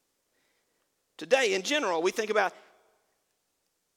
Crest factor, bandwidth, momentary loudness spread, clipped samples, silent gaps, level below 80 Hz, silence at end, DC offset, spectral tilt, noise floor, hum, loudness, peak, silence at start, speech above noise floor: 22 dB; 17.5 kHz; 6 LU; under 0.1%; none; -82 dBFS; 1.45 s; under 0.1%; -2 dB/octave; -78 dBFS; none; -27 LUFS; -10 dBFS; 1.2 s; 50 dB